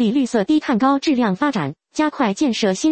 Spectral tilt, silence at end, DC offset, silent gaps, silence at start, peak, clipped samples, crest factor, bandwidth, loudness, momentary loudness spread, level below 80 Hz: -5 dB/octave; 0 s; under 0.1%; none; 0 s; -4 dBFS; under 0.1%; 14 dB; 8.8 kHz; -19 LUFS; 5 LU; -56 dBFS